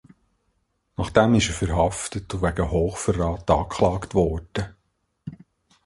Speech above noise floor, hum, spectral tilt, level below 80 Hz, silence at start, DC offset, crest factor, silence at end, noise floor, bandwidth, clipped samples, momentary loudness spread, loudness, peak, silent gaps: 49 dB; none; -5.5 dB/octave; -36 dBFS; 1 s; under 0.1%; 22 dB; 0.5 s; -72 dBFS; 11.5 kHz; under 0.1%; 18 LU; -23 LUFS; -2 dBFS; none